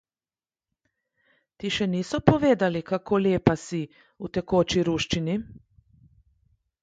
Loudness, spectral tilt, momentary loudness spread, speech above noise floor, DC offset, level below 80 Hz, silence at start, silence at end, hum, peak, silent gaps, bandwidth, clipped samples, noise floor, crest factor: -25 LUFS; -6 dB/octave; 12 LU; over 66 dB; under 0.1%; -50 dBFS; 1.6 s; 1.25 s; none; 0 dBFS; none; 9.2 kHz; under 0.1%; under -90 dBFS; 26 dB